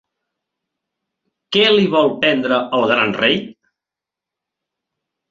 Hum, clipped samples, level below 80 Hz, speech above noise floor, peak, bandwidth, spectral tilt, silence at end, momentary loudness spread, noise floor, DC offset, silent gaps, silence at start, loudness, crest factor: none; under 0.1%; -60 dBFS; 71 dB; -2 dBFS; 7.6 kHz; -5.5 dB/octave; 1.8 s; 5 LU; -86 dBFS; under 0.1%; none; 1.5 s; -15 LUFS; 18 dB